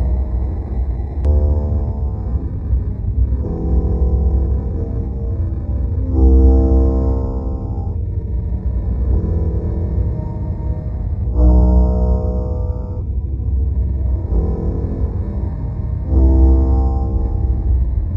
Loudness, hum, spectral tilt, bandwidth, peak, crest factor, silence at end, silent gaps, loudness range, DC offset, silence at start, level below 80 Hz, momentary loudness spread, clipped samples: -18 LUFS; none; -12.5 dB/octave; 1.9 kHz; -2 dBFS; 14 dB; 0 s; none; 4 LU; under 0.1%; 0 s; -16 dBFS; 10 LU; under 0.1%